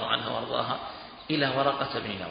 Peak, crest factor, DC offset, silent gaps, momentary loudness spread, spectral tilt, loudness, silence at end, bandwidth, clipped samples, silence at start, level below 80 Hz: -10 dBFS; 20 dB; under 0.1%; none; 10 LU; -9 dB/octave; -29 LUFS; 0 s; 5.2 kHz; under 0.1%; 0 s; -60 dBFS